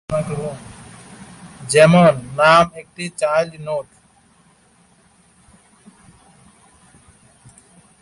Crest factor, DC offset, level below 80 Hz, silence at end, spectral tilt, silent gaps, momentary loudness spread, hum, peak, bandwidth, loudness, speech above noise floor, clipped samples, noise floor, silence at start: 20 dB; under 0.1%; -52 dBFS; 4.2 s; -5.5 dB/octave; none; 28 LU; none; -2 dBFS; 11.5 kHz; -16 LUFS; 39 dB; under 0.1%; -54 dBFS; 0.1 s